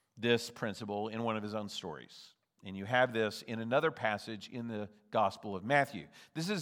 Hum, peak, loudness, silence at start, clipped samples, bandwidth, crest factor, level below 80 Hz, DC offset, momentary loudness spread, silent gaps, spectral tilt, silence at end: none; -14 dBFS; -35 LUFS; 0.15 s; under 0.1%; 16.5 kHz; 22 dB; -82 dBFS; under 0.1%; 15 LU; none; -5 dB/octave; 0 s